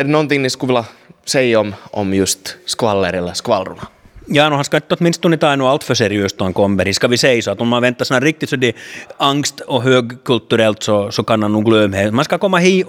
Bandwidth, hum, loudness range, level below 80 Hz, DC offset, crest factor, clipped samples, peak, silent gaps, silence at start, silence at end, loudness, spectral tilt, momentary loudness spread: 17 kHz; none; 3 LU; -52 dBFS; under 0.1%; 16 dB; under 0.1%; 0 dBFS; none; 0 s; 0 s; -15 LUFS; -4.5 dB/octave; 6 LU